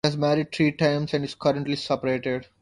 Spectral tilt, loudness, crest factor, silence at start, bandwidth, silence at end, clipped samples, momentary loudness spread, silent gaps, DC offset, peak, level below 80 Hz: -6 dB/octave; -25 LUFS; 18 dB; 0.05 s; 11.5 kHz; 0.15 s; under 0.1%; 5 LU; none; under 0.1%; -6 dBFS; -58 dBFS